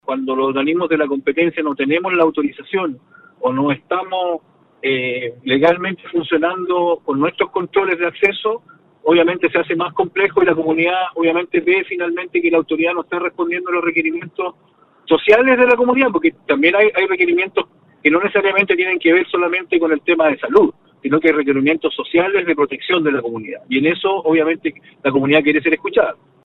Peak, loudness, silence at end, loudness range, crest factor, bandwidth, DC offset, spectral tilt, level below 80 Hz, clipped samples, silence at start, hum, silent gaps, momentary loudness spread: 0 dBFS; -16 LUFS; 0.3 s; 4 LU; 16 dB; 4.7 kHz; under 0.1%; -7.5 dB/octave; -60 dBFS; under 0.1%; 0.1 s; none; none; 8 LU